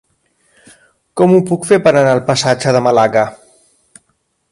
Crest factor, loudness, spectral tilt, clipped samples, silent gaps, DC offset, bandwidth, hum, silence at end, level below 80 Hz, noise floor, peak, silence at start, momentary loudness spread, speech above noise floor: 14 dB; -12 LUFS; -5.5 dB/octave; under 0.1%; none; under 0.1%; 11.5 kHz; none; 1.15 s; -54 dBFS; -64 dBFS; 0 dBFS; 1.15 s; 5 LU; 53 dB